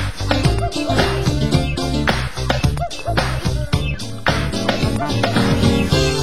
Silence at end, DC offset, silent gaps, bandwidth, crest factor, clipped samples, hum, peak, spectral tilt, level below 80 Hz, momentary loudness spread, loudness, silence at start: 0 s; 3%; none; 16 kHz; 16 dB; under 0.1%; none; -2 dBFS; -5.5 dB/octave; -26 dBFS; 5 LU; -19 LUFS; 0 s